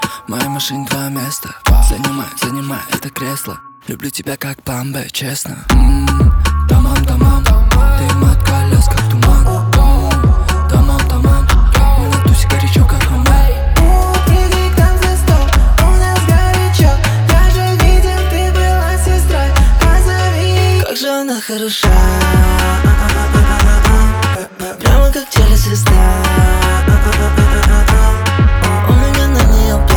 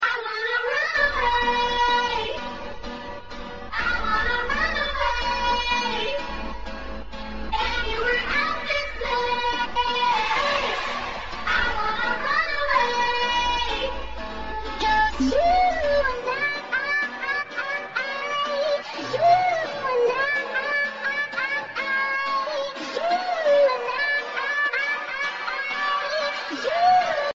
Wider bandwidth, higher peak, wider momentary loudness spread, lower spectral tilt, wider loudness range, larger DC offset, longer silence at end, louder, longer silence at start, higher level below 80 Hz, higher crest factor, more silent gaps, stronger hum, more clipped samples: first, 19.5 kHz vs 7.8 kHz; first, 0 dBFS vs -8 dBFS; about the same, 9 LU vs 10 LU; first, -5 dB/octave vs 0 dB/octave; first, 6 LU vs 3 LU; second, under 0.1% vs 1%; about the same, 0 s vs 0 s; first, -12 LUFS vs -23 LUFS; about the same, 0 s vs 0 s; first, -12 dBFS vs -42 dBFS; second, 10 dB vs 16 dB; neither; neither; neither